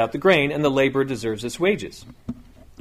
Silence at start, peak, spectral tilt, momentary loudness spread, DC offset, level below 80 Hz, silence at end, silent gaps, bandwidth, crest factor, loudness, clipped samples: 0 s; -4 dBFS; -5.5 dB/octave; 19 LU; under 0.1%; -50 dBFS; 0.4 s; none; 15 kHz; 18 dB; -21 LUFS; under 0.1%